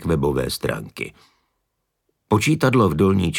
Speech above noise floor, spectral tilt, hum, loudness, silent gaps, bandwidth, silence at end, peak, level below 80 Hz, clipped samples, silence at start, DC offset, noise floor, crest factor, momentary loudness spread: 56 dB; -6 dB/octave; none; -20 LUFS; none; 19 kHz; 0 s; -4 dBFS; -42 dBFS; under 0.1%; 0 s; under 0.1%; -75 dBFS; 16 dB; 15 LU